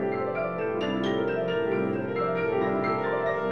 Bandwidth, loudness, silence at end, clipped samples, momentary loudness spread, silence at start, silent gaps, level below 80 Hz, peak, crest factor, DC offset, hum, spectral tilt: 6.8 kHz; -27 LUFS; 0 s; under 0.1%; 3 LU; 0 s; none; -58 dBFS; -14 dBFS; 12 dB; 0.2%; none; -7.5 dB/octave